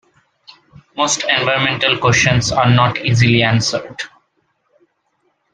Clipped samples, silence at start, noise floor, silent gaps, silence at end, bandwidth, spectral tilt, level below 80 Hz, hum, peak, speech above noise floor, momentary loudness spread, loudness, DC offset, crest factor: under 0.1%; 0.95 s; -65 dBFS; none; 1.45 s; 9.6 kHz; -4 dB/octave; -44 dBFS; none; 0 dBFS; 51 dB; 14 LU; -14 LUFS; under 0.1%; 16 dB